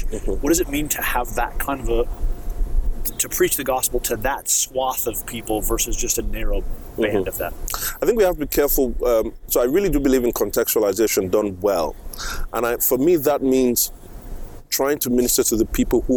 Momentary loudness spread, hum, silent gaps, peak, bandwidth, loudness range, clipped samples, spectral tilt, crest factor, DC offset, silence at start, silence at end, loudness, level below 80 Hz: 10 LU; none; none; -6 dBFS; over 20 kHz; 4 LU; under 0.1%; -3.5 dB/octave; 14 dB; under 0.1%; 0 s; 0 s; -21 LUFS; -28 dBFS